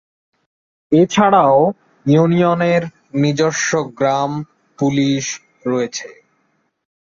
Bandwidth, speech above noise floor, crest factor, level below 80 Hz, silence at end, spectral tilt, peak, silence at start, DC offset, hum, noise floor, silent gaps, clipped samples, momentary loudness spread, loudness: 7.6 kHz; 50 dB; 16 dB; -58 dBFS; 1.1 s; -5.5 dB/octave; -2 dBFS; 0.9 s; under 0.1%; none; -65 dBFS; none; under 0.1%; 13 LU; -16 LUFS